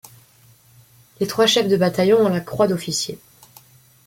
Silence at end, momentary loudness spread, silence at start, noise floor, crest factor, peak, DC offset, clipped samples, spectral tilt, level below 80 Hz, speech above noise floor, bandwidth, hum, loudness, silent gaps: 0.9 s; 11 LU; 1.2 s; -52 dBFS; 16 dB; -4 dBFS; under 0.1%; under 0.1%; -4.5 dB/octave; -58 dBFS; 34 dB; 17 kHz; none; -19 LUFS; none